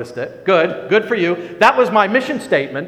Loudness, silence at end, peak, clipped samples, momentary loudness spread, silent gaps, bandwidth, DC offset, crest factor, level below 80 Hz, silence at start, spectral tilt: -15 LUFS; 0 s; 0 dBFS; under 0.1%; 6 LU; none; 14.5 kHz; under 0.1%; 16 dB; -60 dBFS; 0 s; -5.5 dB/octave